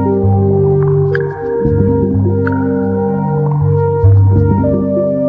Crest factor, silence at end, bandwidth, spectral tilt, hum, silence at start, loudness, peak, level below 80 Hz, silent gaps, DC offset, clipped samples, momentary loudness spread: 10 dB; 0 s; 2.3 kHz; -12.5 dB/octave; none; 0 s; -12 LUFS; 0 dBFS; -30 dBFS; none; under 0.1%; under 0.1%; 5 LU